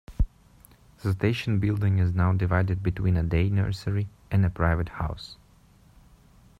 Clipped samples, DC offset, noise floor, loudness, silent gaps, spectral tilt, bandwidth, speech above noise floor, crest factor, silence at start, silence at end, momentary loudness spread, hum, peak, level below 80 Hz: under 0.1%; under 0.1%; -56 dBFS; -26 LUFS; none; -8 dB/octave; 7.6 kHz; 32 dB; 16 dB; 0.1 s; 1.25 s; 8 LU; none; -10 dBFS; -38 dBFS